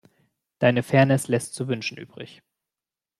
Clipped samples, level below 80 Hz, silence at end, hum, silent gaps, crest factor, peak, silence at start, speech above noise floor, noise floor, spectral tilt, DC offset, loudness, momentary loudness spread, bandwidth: under 0.1%; -62 dBFS; 0.95 s; none; none; 22 dB; -4 dBFS; 0.6 s; over 67 dB; under -90 dBFS; -6 dB/octave; under 0.1%; -23 LUFS; 21 LU; 13.5 kHz